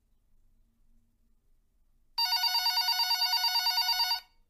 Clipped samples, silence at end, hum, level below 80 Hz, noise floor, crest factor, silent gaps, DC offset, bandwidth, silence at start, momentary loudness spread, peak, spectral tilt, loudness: under 0.1%; 0.3 s; none; -66 dBFS; -67 dBFS; 14 dB; none; under 0.1%; 15.5 kHz; 2.15 s; 4 LU; -18 dBFS; 4.5 dB/octave; -26 LUFS